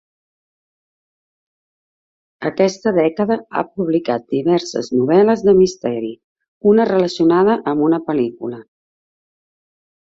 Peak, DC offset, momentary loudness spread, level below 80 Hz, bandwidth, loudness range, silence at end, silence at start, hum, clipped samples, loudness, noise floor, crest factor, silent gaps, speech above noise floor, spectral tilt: -2 dBFS; under 0.1%; 11 LU; -58 dBFS; 7.8 kHz; 6 LU; 1.45 s; 2.4 s; none; under 0.1%; -16 LUFS; under -90 dBFS; 16 dB; 6.24-6.36 s, 6.48-6.61 s; over 74 dB; -6.5 dB/octave